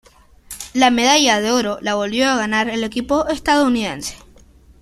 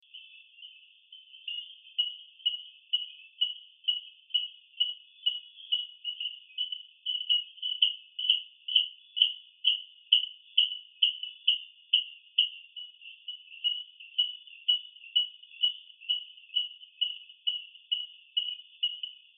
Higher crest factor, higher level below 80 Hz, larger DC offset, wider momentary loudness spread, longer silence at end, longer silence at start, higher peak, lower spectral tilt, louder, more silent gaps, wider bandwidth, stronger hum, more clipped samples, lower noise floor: second, 18 dB vs 26 dB; first, -46 dBFS vs under -90 dBFS; neither; about the same, 13 LU vs 13 LU; first, 0.65 s vs 0.25 s; first, 0.5 s vs 0.15 s; first, 0 dBFS vs -8 dBFS; first, -2.5 dB/octave vs 14.5 dB/octave; first, -17 LUFS vs -30 LUFS; neither; first, 14 kHz vs 3.8 kHz; neither; neither; second, -47 dBFS vs -55 dBFS